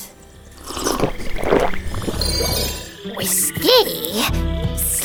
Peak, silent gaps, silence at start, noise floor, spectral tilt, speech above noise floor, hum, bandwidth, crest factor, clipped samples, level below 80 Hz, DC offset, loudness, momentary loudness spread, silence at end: 0 dBFS; none; 0 s; -42 dBFS; -3 dB/octave; 24 dB; none; over 20 kHz; 18 dB; under 0.1%; -28 dBFS; under 0.1%; -19 LUFS; 14 LU; 0 s